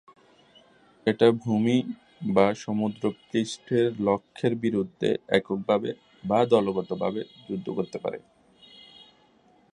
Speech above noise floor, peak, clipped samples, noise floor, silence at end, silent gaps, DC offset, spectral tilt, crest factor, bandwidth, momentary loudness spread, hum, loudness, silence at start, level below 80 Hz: 35 dB; -6 dBFS; under 0.1%; -61 dBFS; 1.55 s; none; under 0.1%; -6.5 dB/octave; 22 dB; 10.5 kHz; 13 LU; none; -26 LUFS; 1.05 s; -64 dBFS